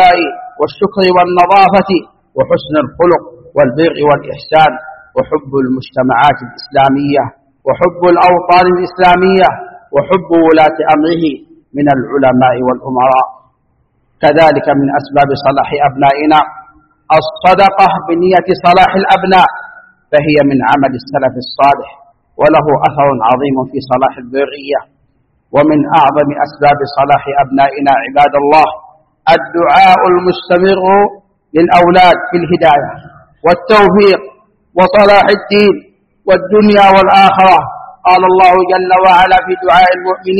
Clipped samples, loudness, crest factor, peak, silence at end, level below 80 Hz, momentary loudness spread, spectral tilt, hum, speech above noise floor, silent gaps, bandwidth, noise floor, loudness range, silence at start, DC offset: 0.5%; -9 LUFS; 10 dB; 0 dBFS; 0 s; -42 dBFS; 10 LU; -7 dB/octave; none; 48 dB; none; 8.6 kHz; -57 dBFS; 5 LU; 0 s; under 0.1%